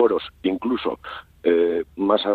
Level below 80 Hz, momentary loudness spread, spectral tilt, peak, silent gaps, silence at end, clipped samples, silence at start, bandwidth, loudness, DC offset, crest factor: -54 dBFS; 9 LU; -7 dB/octave; -6 dBFS; none; 0 s; under 0.1%; 0 s; 4.7 kHz; -23 LUFS; under 0.1%; 16 dB